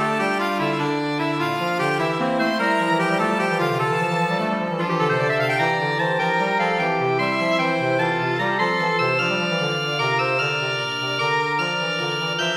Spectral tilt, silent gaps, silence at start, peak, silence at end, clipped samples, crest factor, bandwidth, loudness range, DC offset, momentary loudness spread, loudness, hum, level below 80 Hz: -5 dB/octave; none; 0 s; -8 dBFS; 0 s; under 0.1%; 14 dB; 16.5 kHz; 1 LU; under 0.1%; 3 LU; -21 LUFS; none; -68 dBFS